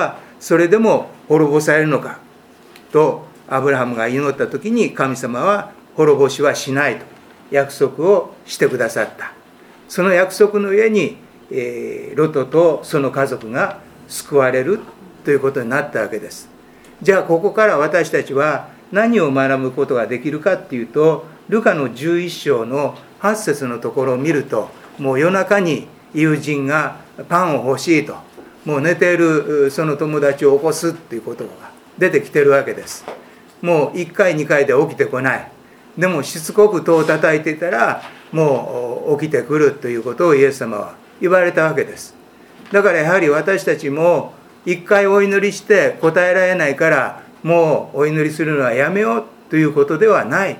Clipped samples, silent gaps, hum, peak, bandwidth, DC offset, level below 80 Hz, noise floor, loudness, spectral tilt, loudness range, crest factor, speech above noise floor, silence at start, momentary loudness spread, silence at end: under 0.1%; none; none; 0 dBFS; 16.5 kHz; under 0.1%; -64 dBFS; -44 dBFS; -16 LUFS; -5.5 dB/octave; 4 LU; 16 dB; 29 dB; 0 s; 12 LU; 0 s